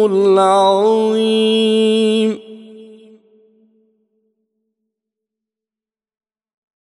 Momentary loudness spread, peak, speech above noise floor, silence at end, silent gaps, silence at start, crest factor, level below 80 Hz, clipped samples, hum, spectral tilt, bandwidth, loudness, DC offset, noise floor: 5 LU; -2 dBFS; over 77 dB; 4 s; none; 0 s; 14 dB; -74 dBFS; under 0.1%; none; -5 dB/octave; 11.5 kHz; -13 LUFS; under 0.1%; under -90 dBFS